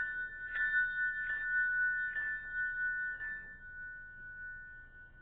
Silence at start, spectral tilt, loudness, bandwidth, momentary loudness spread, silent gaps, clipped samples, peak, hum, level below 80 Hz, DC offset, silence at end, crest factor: 0 s; 0.5 dB/octave; -35 LUFS; 4 kHz; 17 LU; none; under 0.1%; -22 dBFS; none; -60 dBFS; under 0.1%; 0 s; 14 dB